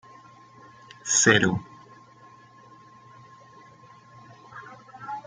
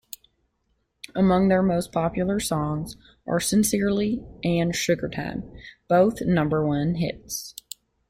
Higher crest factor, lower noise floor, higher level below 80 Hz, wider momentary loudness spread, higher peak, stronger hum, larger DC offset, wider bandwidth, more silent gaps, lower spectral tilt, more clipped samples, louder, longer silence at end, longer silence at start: first, 26 dB vs 16 dB; second, -52 dBFS vs -72 dBFS; second, -64 dBFS vs -48 dBFS; first, 28 LU vs 18 LU; first, -4 dBFS vs -8 dBFS; neither; neither; second, 10 kHz vs 16.5 kHz; neither; second, -2.5 dB/octave vs -5.5 dB/octave; neither; first, -21 LUFS vs -24 LUFS; second, 0.05 s vs 0.6 s; about the same, 1.05 s vs 1.15 s